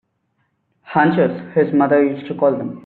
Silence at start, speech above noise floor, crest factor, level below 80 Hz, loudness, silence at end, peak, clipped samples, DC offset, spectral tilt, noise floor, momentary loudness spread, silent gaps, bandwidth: 0.9 s; 52 dB; 16 dB; -62 dBFS; -17 LUFS; 0.05 s; -2 dBFS; under 0.1%; under 0.1%; -6.5 dB/octave; -68 dBFS; 5 LU; none; 4.4 kHz